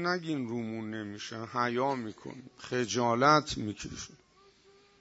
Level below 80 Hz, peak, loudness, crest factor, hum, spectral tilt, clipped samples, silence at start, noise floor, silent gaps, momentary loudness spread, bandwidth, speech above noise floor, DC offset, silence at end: -62 dBFS; -8 dBFS; -31 LUFS; 24 dB; none; -4.5 dB/octave; under 0.1%; 0 s; -62 dBFS; none; 19 LU; 8 kHz; 30 dB; under 0.1%; 0.85 s